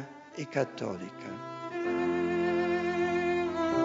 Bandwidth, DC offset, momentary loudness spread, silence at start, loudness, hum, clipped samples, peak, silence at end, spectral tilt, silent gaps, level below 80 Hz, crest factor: 7.6 kHz; under 0.1%; 12 LU; 0 s; -31 LUFS; none; under 0.1%; -14 dBFS; 0 s; -5 dB/octave; none; -64 dBFS; 16 dB